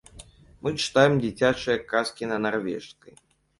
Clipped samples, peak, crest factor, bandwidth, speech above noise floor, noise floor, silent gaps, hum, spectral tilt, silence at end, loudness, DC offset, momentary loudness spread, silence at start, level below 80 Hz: under 0.1%; -4 dBFS; 22 dB; 11.5 kHz; 24 dB; -49 dBFS; none; none; -5 dB/octave; 0.7 s; -25 LUFS; under 0.1%; 13 LU; 0.15 s; -56 dBFS